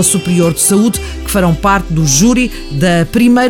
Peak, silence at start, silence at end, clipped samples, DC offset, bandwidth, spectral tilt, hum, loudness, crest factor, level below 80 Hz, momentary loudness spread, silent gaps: 0 dBFS; 0 s; 0 s; under 0.1%; under 0.1%; 18.5 kHz; -4.5 dB/octave; none; -11 LUFS; 10 dB; -26 dBFS; 6 LU; none